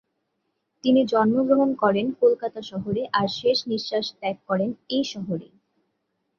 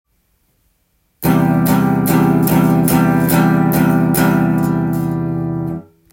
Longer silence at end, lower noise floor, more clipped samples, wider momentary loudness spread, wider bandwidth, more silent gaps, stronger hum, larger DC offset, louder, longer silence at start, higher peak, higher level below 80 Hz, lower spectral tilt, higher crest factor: first, 0.95 s vs 0.3 s; first, -76 dBFS vs -62 dBFS; neither; first, 11 LU vs 8 LU; second, 7.2 kHz vs 17 kHz; neither; neither; neither; second, -23 LUFS vs -14 LUFS; second, 0.85 s vs 1.2 s; second, -6 dBFS vs 0 dBFS; second, -64 dBFS vs -44 dBFS; about the same, -6 dB/octave vs -7 dB/octave; about the same, 18 dB vs 14 dB